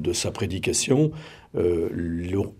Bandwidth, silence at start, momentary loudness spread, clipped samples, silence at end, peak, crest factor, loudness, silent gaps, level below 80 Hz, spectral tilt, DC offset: 16 kHz; 0 s; 8 LU; under 0.1%; 0.05 s; -6 dBFS; 18 dB; -25 LUFS; none; -52 dBFS; -4.5 dB/octave; under 0.1%